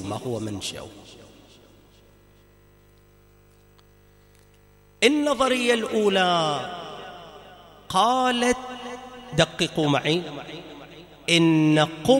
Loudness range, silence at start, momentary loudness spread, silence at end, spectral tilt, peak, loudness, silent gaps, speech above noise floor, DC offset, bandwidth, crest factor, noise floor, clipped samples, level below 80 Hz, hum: 7 LU; 0 s; 20 LU; 0 s; -4.5 dB/octave; -4 dBFS; -22 LUFS; none; 33 dB; under 0.1%; 16 kHz; 22 dB; -55 dBFS; under 0.1%; -56 dBFS; 50 Hz at -55 dBFS